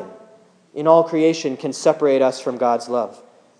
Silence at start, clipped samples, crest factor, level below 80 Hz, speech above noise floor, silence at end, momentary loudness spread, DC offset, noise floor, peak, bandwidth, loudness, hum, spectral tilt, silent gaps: 0 s; under 0.1%; 18 dB; -84 dBFS; 33 dB; 0.45 s; 11 LU; under 0.1%; -51 dBFS; 0 dBFS; 10.5 kHz; -18 LUFS; none; -5 dB/octave; none